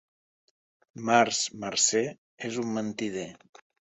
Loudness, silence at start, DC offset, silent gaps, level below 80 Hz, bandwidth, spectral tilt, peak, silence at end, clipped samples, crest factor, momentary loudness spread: -27 LUFS; 0.95 s; under 0.1%; 2.18-2.38 s; -72 dBFS; 8.4 kHz; -2.5 dB/octave; -8 dBFS; 0.6 s; under 0.1%; 22 dB; 14 LU